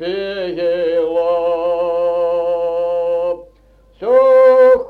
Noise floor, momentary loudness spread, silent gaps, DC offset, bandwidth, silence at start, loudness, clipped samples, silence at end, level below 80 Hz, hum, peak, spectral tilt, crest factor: -49 dBFS; 13 LU; none; under 0.1%; 4.6 kHz; 0 s; -15 LUFS; under 0.1%; 0 s; -50 dBFS; none; -2 dBFS; -6 dB/octave; 12 dB